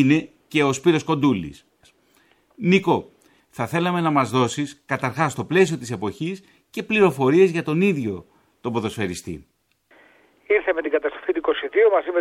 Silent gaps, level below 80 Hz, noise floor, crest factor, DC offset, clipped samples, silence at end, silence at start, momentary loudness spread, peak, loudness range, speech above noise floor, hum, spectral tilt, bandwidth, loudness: none; -58 dBFS; -60 dBFS; 18 dB; under 0.1%; under 0.1%; 0 s; 0 s; 13 LU; -4 dBFS; 5 LU; 39 dB; none; -6 dB/octave; 15.5 kHz; -21 LUFS